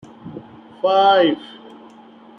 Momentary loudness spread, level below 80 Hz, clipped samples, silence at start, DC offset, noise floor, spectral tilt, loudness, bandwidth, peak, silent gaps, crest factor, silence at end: 24 LU; -68 dBFS; under 0.1%; 0.25 s; under 0.1%; -44 dBFS; -6 dB/octave; -16 LUFS; 6.6 kHz; -2 dBFS; none; 18 dB; 0.95 s